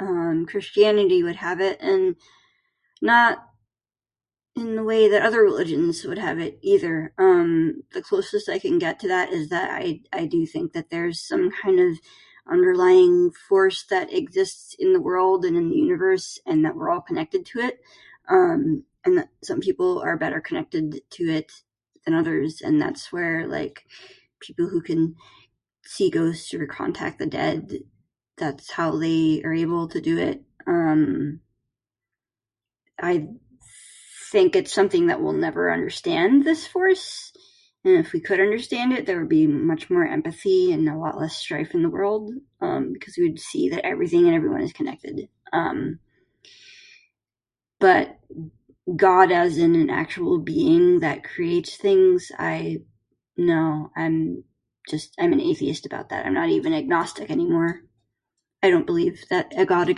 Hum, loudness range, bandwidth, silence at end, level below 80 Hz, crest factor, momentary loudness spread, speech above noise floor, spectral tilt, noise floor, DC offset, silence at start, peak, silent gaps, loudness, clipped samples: none; 7 LU; 11.5 kHz; 0 s; -62 dBFS; 20 dB; 12 LU; over 69 dB; -6 dB/octave; under -90 dBFS; under 0.1%; 0 s; -2 dBFS; none; -22 LUFS; under 0.1%